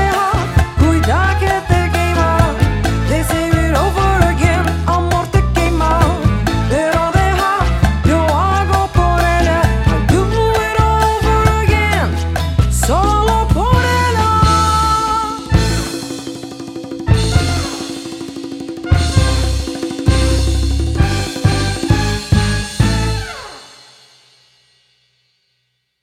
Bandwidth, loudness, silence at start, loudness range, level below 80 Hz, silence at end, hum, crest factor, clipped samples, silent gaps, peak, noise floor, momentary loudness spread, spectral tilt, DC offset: 16 kHz; -14 LUFS; 0 s; 5 LU; -20 dBFS; 2.35 s; none; 14 dB; under 0.1%; none; 0 dBFS; -67 dBFS; 9 LU; -5.5 dB/octave; under 0.1%